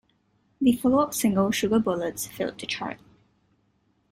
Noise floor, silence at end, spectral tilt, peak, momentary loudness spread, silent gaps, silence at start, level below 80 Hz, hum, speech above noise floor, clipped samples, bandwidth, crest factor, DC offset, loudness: -68 dBFS; 1.15 s; -4.5 dB/octave; -10 dBFS; 9 LU; none; 0.6 s; -58 dBFS; none; 44 dB; under 0.1%; 16 kHz; 18 dB; under 0.1%; -25 LUFS